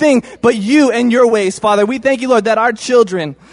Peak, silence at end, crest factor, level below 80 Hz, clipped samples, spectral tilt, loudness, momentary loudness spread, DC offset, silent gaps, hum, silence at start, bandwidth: 0 dBFS; 0.2 s; 12 dB; -54 dBFS; under 0.1%; -4.5 dB/octave; -12 LUFS; 4 LU; under 0.1%; none; none; 0 s; 11 kHz